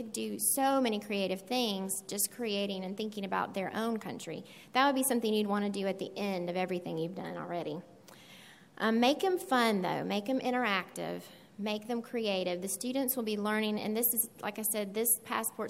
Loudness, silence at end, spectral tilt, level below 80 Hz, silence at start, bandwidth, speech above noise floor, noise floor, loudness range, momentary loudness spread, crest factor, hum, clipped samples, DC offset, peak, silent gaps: -32 LUFS; 0 s; -3.5 dB/octave; -80 dBFS; 0 s; 16 kHz; 23 dB; -55 dBFS; 3 LU; 11 LU; 20 dB; none; under 0.1%; under 0.1%; -12 dBFS; none